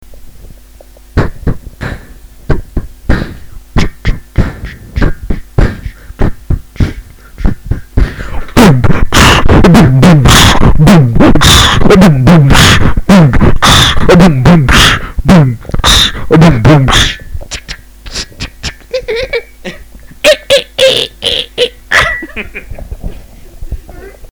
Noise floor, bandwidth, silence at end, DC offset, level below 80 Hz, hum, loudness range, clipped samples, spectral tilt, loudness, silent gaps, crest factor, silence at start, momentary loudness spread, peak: -35 dBFS; over 20 kHz; 0.05 s; under 0.1%; -16 dBFS; none; 13 LU; 0.3%; -5 dB/octave; -7 LUFS; none; 8 dB; 0.1 s; 19 LU; 0 dBFS